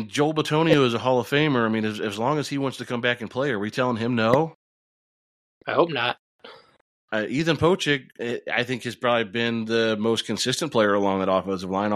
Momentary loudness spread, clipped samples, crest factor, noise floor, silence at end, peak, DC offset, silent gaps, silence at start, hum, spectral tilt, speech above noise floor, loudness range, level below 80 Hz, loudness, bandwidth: 7 LU; under 0.1%; 20 dB; under -90 dBFS; 0 s; -4 dBFS; under 0.1%; 4.55-5.61 s, 6.19-6.39 s, 6.81-7.08 s; 0 s; none; -5 dB/octave; over 67 dB; 3 LU; -60 dBFS; -23 LUFS; 15 kHz